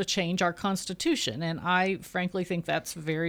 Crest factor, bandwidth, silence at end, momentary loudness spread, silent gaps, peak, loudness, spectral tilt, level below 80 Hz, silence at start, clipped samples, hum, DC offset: 16 dB; 19.5 kHz; 0 s; 5 LU; none; -12 dBFS; -29 LUFS; -4 dB/octave; -60 dBFS; 0 s; under 0.1%; none; under 0.1%